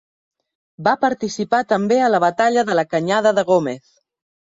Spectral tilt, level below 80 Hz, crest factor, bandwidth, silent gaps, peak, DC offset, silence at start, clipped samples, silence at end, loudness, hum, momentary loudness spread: -5 dB/octave; -64 dBFS; 16 dB; 7.8 kHz; none; -4 dBFS; under 0.1%; 0.8 s; under 0.1%; 0.8 s; -18 LUFS; none; 6 LU